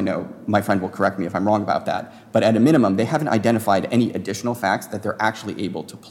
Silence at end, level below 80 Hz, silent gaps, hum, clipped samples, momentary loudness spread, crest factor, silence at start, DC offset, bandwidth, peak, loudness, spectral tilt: 0 s; -64 dBFS; none; none; under 0.1%; 11 LU; 14 dB; 0 s; under 0.1%; 17.5 kHz; -6 dBFS; -21 LUFS; -6 dB/octave